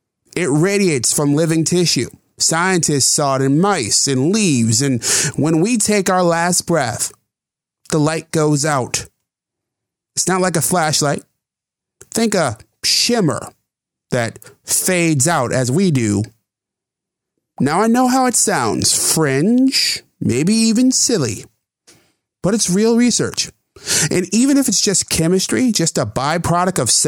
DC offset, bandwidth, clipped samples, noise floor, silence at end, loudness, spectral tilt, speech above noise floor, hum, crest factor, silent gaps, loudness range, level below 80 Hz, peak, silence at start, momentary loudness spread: under 0.1%; 19.5 kHz; under 0.1%; -86 dBFS; 0 s; -15 LUFS; -3.5 dB/octave; 70 dB; none; 16 dB; none; 5 LU; -52 dBFS; -2 dBFS; 0.35 s; 8 LU